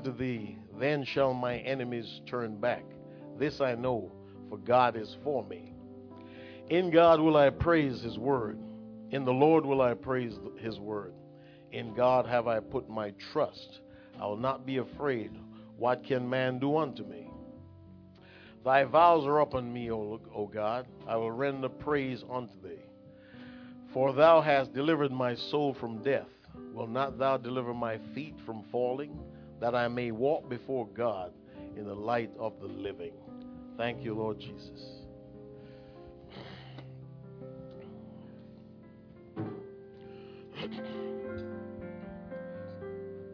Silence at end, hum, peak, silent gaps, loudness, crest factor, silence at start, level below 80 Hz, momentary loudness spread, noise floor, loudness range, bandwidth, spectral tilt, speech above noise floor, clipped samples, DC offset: 0 s; none; -10 dBFS; none; -31 LUFS; 22 dB; 0 s; -60 dBFS; 23 LU; -54 dBFS; 16 LU; 5.4 kHz; -5 dB/octave; 24 dB; under 0.1%; under 0.1%